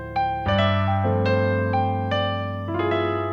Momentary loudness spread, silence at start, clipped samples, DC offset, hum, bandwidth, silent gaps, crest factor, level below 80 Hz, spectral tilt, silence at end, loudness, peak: 5 LU; 0 s; under 0.1%; under 0.1%; none; 5.8 kHz; none; 14 dB; -46 dBFS; -8 dB/octave; 0 s; -23 LUFS; -8 dBFS